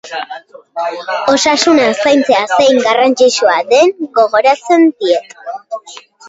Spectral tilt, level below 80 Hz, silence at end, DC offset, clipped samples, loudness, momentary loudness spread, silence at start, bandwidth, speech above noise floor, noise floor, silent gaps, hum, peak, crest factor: -2.5 dB/octave; -56 dBFS; 0.3 s; under 0.1%; under 0.1%; -11 LUFS; 17 LU; 0.05 s; 8 kHz; 24 dB; -36 dBFS; none; none; 0 dBFS; 12 dB